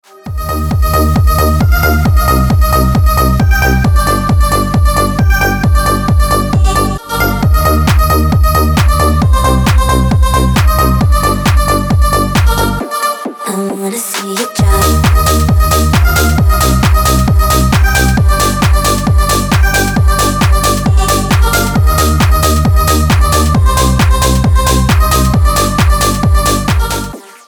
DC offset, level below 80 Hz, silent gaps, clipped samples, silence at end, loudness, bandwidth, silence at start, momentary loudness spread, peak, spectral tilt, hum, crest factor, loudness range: under 0.1%; -12 dBFS; none; under 0.1%; 0.25 s; -10 LUFS; over 20 kHz; 0.25 s; 4 LU; 0 dBFS; -5 dB/octave; none; 10 dB; 2 LU